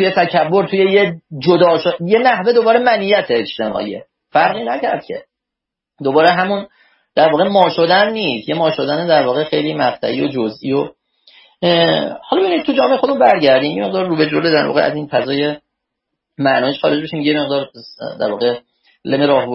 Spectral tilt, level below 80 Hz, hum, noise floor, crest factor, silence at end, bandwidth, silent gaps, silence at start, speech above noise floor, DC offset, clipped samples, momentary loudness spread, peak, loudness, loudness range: -8 dB/octave; -60 dBFS; none; -82 dBFS; 16 dB; 0 s; 5.8 kHz; none; 0 s; 68 dB; under 0.1%; under 0.1%; 9 LU; 0 dBFS; -15 LUFS; 5 LU